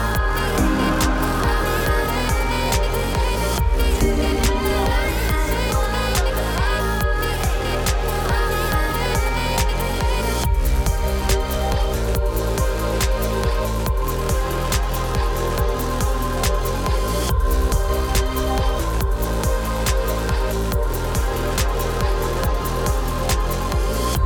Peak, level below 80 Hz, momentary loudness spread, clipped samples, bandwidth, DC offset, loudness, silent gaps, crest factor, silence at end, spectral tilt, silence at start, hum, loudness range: -8 dBFS; -22 dBFS; 3 LU; under 0.1%; 19 kHz; under 0.1%; -21 LUFS; none; 12 dB; 0 s; -4.5 dB/octave; 0 s; none; 2 LU